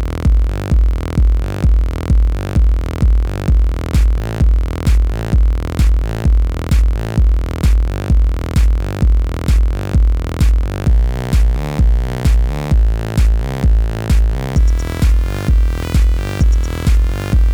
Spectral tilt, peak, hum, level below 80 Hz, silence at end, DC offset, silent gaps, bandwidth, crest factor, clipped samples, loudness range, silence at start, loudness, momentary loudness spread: -7 dB/octave; -4 dBFS; none; -14 dBFS; 0 s; under 0.1%; none; 10.5 kHz; 10 dB; under 0.1%; 0 LU; 0 s; -16 LUFS; 1 LU